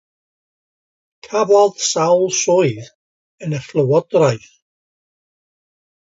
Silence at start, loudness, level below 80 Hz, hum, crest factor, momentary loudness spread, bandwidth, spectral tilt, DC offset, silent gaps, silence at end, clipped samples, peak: 1.25 s; -16 LUFS; -64 dBFS; none; 18 dB; 12 LU; 7.8 kHz; -4.5 dB/octave; under 0.1%; 2.95-3.38 s; 1.75 s; under 0.1%; -2 dBFS